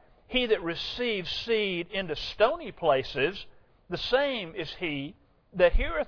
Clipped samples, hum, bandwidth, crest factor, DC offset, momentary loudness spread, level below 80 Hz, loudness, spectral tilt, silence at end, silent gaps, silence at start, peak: under 0.1%; none; 5.4 kHz; 20 dB; under 0.1%; 10 LU; -38 dBFS; -28 LUFS; -5.5 dB/octave; 0 s; none; 0.3 s; -10 dBFS